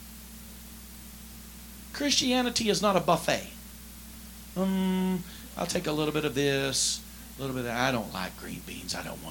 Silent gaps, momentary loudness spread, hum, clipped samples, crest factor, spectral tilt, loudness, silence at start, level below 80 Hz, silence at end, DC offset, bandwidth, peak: none; 20 LU; 60 Hz at -50 dBFS; under 0.1%; 22 dB; -3.5 dB/octave; -28 LUFS; 0 s; -50 dBFS; 0 s; under 0.1%; 17.5 kHz; -8 dBFS